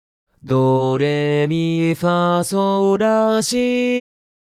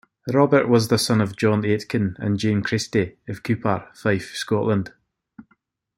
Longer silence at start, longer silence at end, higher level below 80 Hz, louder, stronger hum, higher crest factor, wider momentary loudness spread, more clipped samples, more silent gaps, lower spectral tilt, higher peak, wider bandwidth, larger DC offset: first, 0.45 s vs 0.25 s; about the same, 0.5 s vs 0.55 s; about the same, -56 dBFS vs -58 dBFS; first, -17 LUFS vs -21 LUFS; neither; second, 12 dB vs 20 dB; second, 3 LU vs 8 LU; neither; neither; about the same, -6 dB/octave vs -6 dB/octave; second, -6 dBFS vs -2 dBFS; about the same, 15 kHz vs 16.5 kHz; neither